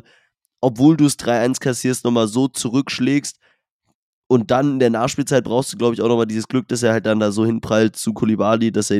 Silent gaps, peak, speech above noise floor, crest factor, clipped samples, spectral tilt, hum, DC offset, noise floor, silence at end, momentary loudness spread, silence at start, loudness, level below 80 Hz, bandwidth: 3.72-3.80 s, 3.95-4.30 s; -2 dBFS; 54 dB; 16 dB; under 0.1%; -5.5 dB/octave; none; under 0.1%; -71 dBFS; 0 s; 5 LU; 0.6 s; -18 LUFS; -56 dBFS; 15 kHz